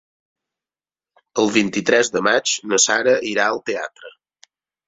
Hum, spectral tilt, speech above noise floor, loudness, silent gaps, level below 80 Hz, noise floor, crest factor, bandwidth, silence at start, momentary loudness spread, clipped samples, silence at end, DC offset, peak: none; -2 dB/octave; over 72 dB; -18 LUFS; none; -64 dBFS; under -90 dBFS; 20 dB; 8 kHz; 1.35 s; 11 LU; under 0.1%; 0.8 s; under 0.1%; -2 dBFS